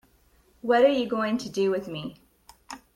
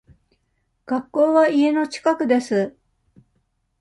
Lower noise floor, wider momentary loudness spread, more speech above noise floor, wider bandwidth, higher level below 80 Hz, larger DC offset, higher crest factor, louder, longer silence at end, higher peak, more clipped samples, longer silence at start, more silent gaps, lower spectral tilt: second, -62 dBFS vs -70 dBFS; first, 20 LU vs 11 LU; second, 38 dB vs 51 dB; first, 16 kHz vs 11.5 kHz; about the same, -64 dBFS vs -64 dBFS; neither; about the same, 18 dB vs 16 dB; second, -25 LUFS vs -20 LUFS; second, 0.2 s vs 1.1 s; about the same, -8 dBFS vs -6 dBFS; neither; second, 0.65 s vs 0.9 s; neither; about the same, -5 dB/octave vs -5.5 dB/octave